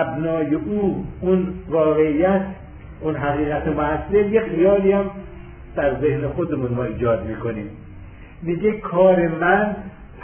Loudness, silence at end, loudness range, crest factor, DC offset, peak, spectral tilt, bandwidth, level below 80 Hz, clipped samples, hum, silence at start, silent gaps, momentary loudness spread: -20 LUFS; 0 s; 4 LU; 16 dB; under 0.1%; -4 dBFS; -11.5 dB/octave; 3.5 kHz; -40 dBFS; under 0.1%; none; 0 s; none; 15 LU